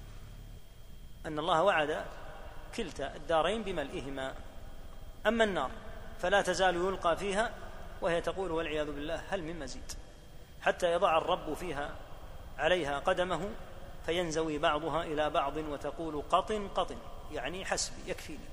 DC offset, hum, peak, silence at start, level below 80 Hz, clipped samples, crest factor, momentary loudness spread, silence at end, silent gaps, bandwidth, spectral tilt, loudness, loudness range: under 0.1%; none; -12 dBFS; 0 s; -48 dBFS; under 0.1%; 22 dB; 20 LU; 0 s; none; 15.5 kHz; -4 dB/octave; -33 LUFS; 4 LU